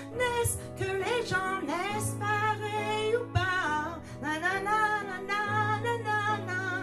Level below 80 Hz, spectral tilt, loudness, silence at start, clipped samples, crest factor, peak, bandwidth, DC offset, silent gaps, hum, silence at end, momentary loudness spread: -54 dBFS; -4 dB/octave; -30 LUFS; 0 s; under 0.1%; 16 dB; -14 dBFS; 13.5 kHz; under 0.1%; none; none; 0 s; 5 LU